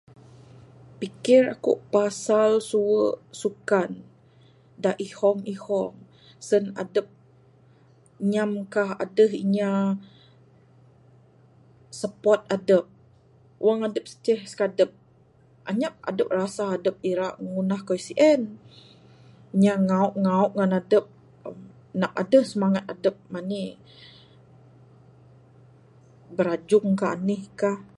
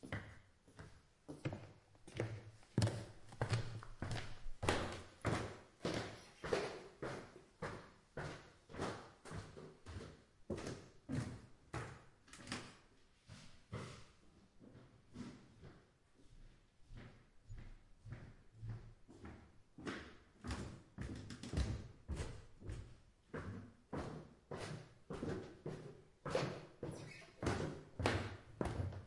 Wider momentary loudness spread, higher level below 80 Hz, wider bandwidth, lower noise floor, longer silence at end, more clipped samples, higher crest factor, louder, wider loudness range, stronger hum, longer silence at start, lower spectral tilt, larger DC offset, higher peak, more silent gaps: second, 13 LU vs 20 LU; second, -70 dBFS vs -58 dBFS; about the same, 11.5 kHz vs 11.5 kHz; second, -57 dBFS vs -69 dBFS; first, 0.15 s vs 0 s; neither; second, 20 dB vs 30 dB; first, -24 LUFS vs -47 LUFS; second, 6 LU vs 14 LU; neither; first, 1 s vs 0 s; about the same, -6.5 dB/octave vs -5.5 dB/octave; neither; first, -6 dBFS vs -18 dBFS; neither